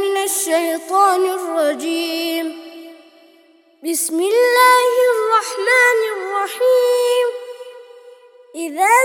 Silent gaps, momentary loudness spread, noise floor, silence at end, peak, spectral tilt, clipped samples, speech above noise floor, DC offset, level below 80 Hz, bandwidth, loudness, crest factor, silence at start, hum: none; 17 LU; -52 dBFS; 0 s; 0 dBFS; 0.5 dB/octave; under 0.1%; 36 dB; under 0.1%; -78 dBFS; 18 kHz; -16 LUFS; 16 dB; 0 s; none